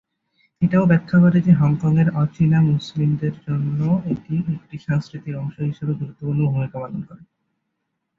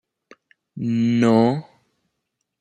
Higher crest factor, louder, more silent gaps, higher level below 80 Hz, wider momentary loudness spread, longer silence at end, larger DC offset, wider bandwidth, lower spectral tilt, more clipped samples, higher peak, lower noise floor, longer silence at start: about the same, 16 dB vs 18 dB; about the same, -20 LUFS vs -19 LUFS; neither; first, -52 dBFS vs -66 dBFS; about the same, 13 LU vs 13 LU; about the same, 1 s vs 1 s; neither; second, 6.8 kHz vs 8.8 kHz; first, -9.5 dB/octave vs -7.5 dB/octave; neither; about the same, -4 dBFS vs -4 dBFS; about the same, -76 dBFS vs -78 dBFS; second, 0.6 s vs 0.75 s